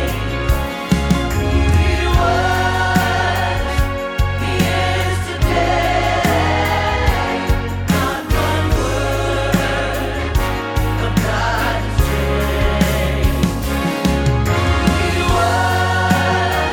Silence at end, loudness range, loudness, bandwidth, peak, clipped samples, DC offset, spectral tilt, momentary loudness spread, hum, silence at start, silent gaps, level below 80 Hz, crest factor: 0 s; 2 LU; -17 LUFS; 19.5 kHz; -2 dBFS; under 0.1%; under 0.1%; -5.5 dB/octave; 4 LU; none; 0 s; none; -22 dBFS; 14 dB